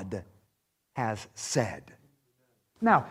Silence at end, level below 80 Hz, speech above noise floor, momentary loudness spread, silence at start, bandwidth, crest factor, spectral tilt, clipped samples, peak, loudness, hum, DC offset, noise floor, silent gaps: 0 s; -66 dBFS; 48 dB; 17 LU; 0 s; 15.5 kHz; 24 dB; -5 dB/octave; under 0.1%; -8 dBFS; -31 LUFS; none; under 0.1%; -77 dBFS; none